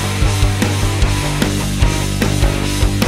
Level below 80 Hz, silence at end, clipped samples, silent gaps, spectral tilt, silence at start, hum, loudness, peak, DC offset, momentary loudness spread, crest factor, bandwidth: -20 dBFS; 0 s; under 0.1%; none; -4.5 dB/octave; 0 s; none; -16 LUFS; 0 dBFS; under 0.1%; 1 LU; 14 dB; 16 kHz